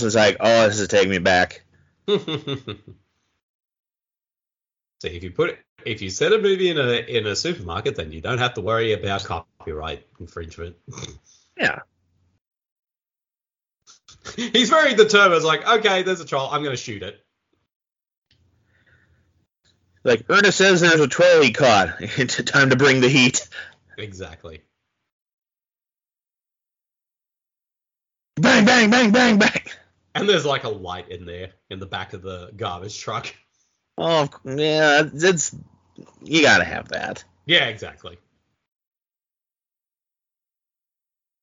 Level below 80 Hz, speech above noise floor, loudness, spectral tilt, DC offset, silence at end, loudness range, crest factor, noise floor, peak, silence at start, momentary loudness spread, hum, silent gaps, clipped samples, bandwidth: -54 dBFS; over 71 dB; -18 LUFS; -4 dB/octave; under 0.1%; 3.35 s; 14 LU; 20 dB; under -90 dBFS; 0 dBFS; 0 s; 22 LU; none; 3.43-3.59 s, 5.69-5.76 s, 12.41-12.45 s, 12.72-12.83 s, 17.76-17.80 s, 18.17-18.22 s, 25.12-25.26 s, 25.33-25.38 s; under 0.1%; 7.8 kHz